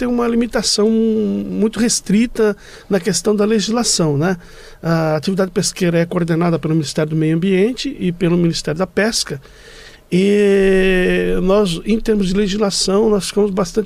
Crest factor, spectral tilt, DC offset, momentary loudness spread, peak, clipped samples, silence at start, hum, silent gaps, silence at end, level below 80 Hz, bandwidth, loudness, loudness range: 12 dB; -5 dB/octave; under 0.1%; 6 LU; -4 dBFS; under 0.1%; 0 s; none; none; 0 s; -34 dBFS; 15.5 kHz; -16 LUFS; 2 LU